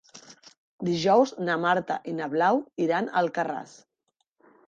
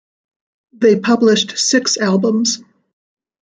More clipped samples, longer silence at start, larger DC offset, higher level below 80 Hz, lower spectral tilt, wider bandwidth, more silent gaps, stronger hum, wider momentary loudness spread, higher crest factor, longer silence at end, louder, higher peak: neither; second, 0.15 s vs 0.8 s; neither; second, -72 dBFS vs -64 dBFS; first, -5.5 dB/octave vs -3.5 dB/octave; about the same, 8.8 kHz vs 9.6 kHz; first, 0.58-0.79 s vs none; neither; first, 10 LU vs 4 LU; first, 20 dB vs 14 dB; first, 1 s vs 0.85 s; second, -26 LUFS vs -14 LUFS; second, -8 dBFS vs -2 dBFS